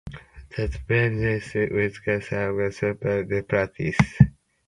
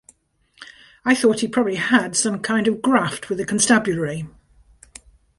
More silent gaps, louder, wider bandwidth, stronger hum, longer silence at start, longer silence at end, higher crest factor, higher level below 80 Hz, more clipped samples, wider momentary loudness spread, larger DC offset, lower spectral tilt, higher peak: neither; second, -24 LUFS vs -19 LUFS; about the same, 11 kHz vs 11.5 kHz; neither; second, 0.05 s vs 0.6 s; second, 0.4 s vs 1.1 s; first, 24 dB vs 18 dB; first, -40 dBFS vs -56 dBFS; neither; about the same, 9 LU vs 10 LU; neither; first, -7.5 dB/octave vs -3.5 dB/octave; about the same, 0 dBFS vs -2 dBFS